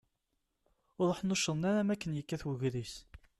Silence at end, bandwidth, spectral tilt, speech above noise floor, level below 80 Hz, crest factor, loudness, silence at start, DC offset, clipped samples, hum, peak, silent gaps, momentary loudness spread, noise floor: 0.2 s; 13 kHz; -5 dB/octave; 49 dB; -62 dBFS; 14 dB; -34 LUFS; 1 s; under 0.1%; under 0.1%; none; -22 dBFS; none; 10 LU; -83 dBFS